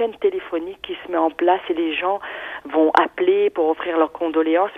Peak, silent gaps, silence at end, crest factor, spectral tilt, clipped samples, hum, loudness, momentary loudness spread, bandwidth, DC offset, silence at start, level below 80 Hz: 0 dBFS; none; 0 s; 20 dB; -5.5 dB/octave; under 0.1%; none; -20 LUFS; 11 LU; 6.2 kHz; under 0.1%; 0 s; -60 dBFS